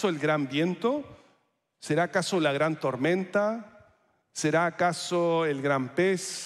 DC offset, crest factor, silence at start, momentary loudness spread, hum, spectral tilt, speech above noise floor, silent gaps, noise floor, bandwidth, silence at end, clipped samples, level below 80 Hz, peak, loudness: under 0.1%; 16 dB; 0 s; 5 LU; none; -5 dB/octave; 44 dB; none; -71 dBFS; 14 kHz; 0 s; under 0.1%; -74 dBFS; -12 dBFS; -27 LUFS